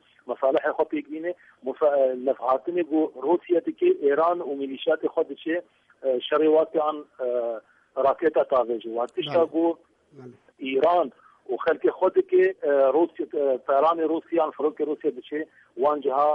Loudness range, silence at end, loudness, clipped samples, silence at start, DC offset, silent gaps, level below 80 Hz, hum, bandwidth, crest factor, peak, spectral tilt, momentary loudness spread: 3 LU; 0 s; -24 LUFS; under 0.1%; 0.25 s; under 0.1%; none; -72 dBFS; none; 5.6 kHz; 14 dB; -10 dBFS; -7 dB/octave; 11 LU